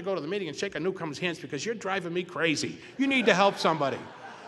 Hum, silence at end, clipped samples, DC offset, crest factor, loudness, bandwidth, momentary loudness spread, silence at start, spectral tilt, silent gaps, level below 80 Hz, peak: none; 0 s; under 0.1%; under 0.1%; 26 dB; -28 LUFS; 12 kHz; 11 LU; 0 s; -4 dB/octave; none; -70 dBFS; -4 dBFS